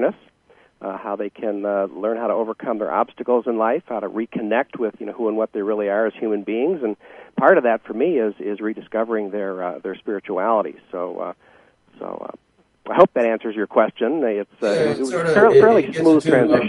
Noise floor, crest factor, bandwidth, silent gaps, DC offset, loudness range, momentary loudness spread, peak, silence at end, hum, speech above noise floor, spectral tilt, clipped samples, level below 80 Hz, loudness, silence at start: -53 dBFS; 20 dB; 11.5 kHz; none; under 0.1%; 8 LU; 14 LU; 0 dBFS; 0 s; none; 34 dB; -6.5 dB/octave; under 0.1%; -64 dBFS; -20 LUFS; 0 s